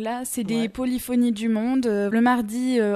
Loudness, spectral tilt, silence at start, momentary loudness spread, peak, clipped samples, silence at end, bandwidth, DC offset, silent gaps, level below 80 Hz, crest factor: -23 LUFS; -5 dB/octave; 0 s; 6 LU; -8 dBFS; under 0.1%; 0 s; 14 kHz; under 0.1%; none; -54 dBFS; 14 dB